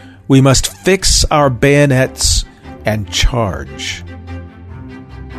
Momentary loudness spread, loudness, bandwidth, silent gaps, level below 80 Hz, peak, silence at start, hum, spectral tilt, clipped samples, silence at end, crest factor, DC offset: 22 LU; -13 LUFS; 13.5 kHz; none; -22 dBFS; 0 dBFS; 0.05 s; none; -4 dB/octave; under 0.1%; 0 s; 14 dB; under 0.1%